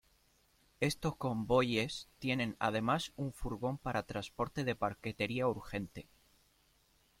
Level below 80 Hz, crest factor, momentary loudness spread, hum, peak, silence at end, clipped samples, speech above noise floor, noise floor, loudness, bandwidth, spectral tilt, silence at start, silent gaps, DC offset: -58 dBFS; 20 dB; 9 LU; none; -16 dBFS; 1.2 s; under 0.1%; 35 dB; -71 dBFS; -36 LUFS; 16.5 kHz; -5.5 dB/octave; 0.8 s; none; under 0.1%